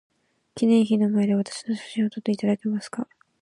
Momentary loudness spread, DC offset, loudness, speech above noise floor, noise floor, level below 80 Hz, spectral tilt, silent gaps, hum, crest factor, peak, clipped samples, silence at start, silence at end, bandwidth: 14 LU; under 0.1%; -24 LUFS; 23 dB; -46 dBFS; -72 dBFS; -6.5 dB/octave; none; none; 16 dB; -10 dBFS; under 0.1%; 0.55 s; 0.35 s; 11 kHz